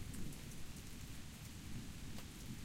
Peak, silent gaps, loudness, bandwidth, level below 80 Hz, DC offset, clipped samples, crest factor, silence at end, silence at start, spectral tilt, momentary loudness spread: -34 dBFS; none; -52 LUFS; 16.5 kHz; -54 dBFS; under 0.1%; under 0.1%; 14 dB; 0 s; 0 s; -4.5 dB/octave; 2 LU